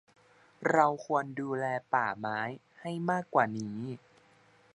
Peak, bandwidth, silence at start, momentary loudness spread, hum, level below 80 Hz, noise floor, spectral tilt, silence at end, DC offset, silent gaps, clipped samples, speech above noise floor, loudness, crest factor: -10 dBFS; 11 kHz; 0.6 s; 13 LU; none; -76 dBFS; -63 dBFS; -6.5 dB/octave; 0.8 s; under 0.1%; none; under 0.1%; 32 dB; -32 LUFS; 22 dB